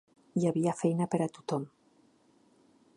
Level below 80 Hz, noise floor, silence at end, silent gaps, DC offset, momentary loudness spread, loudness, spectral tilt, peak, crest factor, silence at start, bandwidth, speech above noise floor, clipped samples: -78 dBFS; -66 dBFS; 1.3 s; none; under 0.1%; 8 LU; -32 LUFS; -7.5 dB/octave; -14 dBFS; 20 dB; 0.35 s; 11.5 kHz; 35 dB; under 0.1%